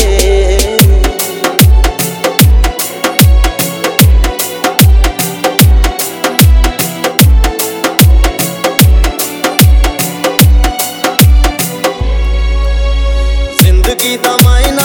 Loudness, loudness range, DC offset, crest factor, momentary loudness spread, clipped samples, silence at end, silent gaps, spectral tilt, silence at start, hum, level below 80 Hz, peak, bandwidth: -9 LUFS; 2 LU; under 0.1%; 8 dB; 6 LU; 1%; 0 s; none; -4.5 dB/octave; 0 s; none; -10 dBFS; 0 dBFS; over 20 kHz